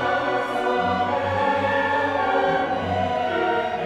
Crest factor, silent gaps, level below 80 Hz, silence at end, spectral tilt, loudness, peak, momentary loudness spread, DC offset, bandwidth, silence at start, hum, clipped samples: 14 dB; none; -54 dBFS; 0 s; -6 dB/octave; -22 LUFS; -10 dBFS; 3 LU; under 0.1%; 12 kHz; 0 s; none; under 0.1%